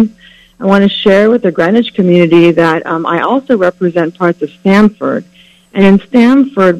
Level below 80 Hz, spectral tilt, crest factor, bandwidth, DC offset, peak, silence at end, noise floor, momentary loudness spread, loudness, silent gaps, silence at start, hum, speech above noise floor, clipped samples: -46 dBFS; -7.5 dB/octave; 10 dB; 9.6 kHz; under 0.1%; 0 dBFS; 0 s; -40 dBFS; 8 LU; -10 LUFS; none; 0 s; none; 32 dB; 1%